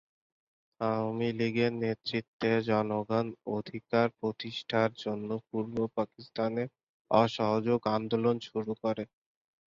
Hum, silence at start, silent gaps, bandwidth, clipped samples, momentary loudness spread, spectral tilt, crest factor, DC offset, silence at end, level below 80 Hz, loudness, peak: none; 0.8 s; 2.28-2.40 s, 6.83-7.05 s; 7.4 kHz; under 0.1%; 8 LU; -7 dB/octave; 22 dB; under 0.1%; 0.65 s; -68 dBFS; -32 LUFS; -10 dBFS